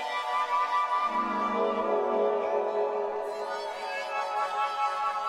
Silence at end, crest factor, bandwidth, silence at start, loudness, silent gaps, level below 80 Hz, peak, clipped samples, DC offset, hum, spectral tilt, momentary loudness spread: 0 s; 14 dB; 14 kHz; 0 s; -29 LUFS; none; -68 dBFS; -14 dBFS; under 0.1%; under 0.1%; none; -3.5 dB/octave; 7 LU